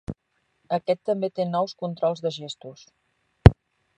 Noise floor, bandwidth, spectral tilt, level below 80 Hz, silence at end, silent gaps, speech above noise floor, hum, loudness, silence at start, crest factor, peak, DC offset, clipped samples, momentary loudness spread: -72 dBFS; 10.5 kHz; -8 dB/octave; -34 dBFS; 0.45 s; none; 46 dB; none; -23 LUFS; 0.1 s; 24 dB; 0 dBFS; under 0.1%; under 0.1%; 21 LU